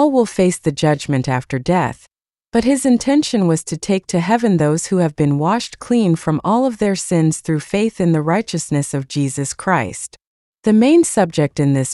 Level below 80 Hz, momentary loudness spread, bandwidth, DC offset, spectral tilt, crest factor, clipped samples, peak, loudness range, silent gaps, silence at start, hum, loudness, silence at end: -48 dBFS; 6 LU; 12 kHz; under 0.1%; -6 dB/octave; 14 dB; under 0.1%; -2 dBFS; 2 LU; 10.27-10.53 s; 0 s; none; -17 LUFS; 0 s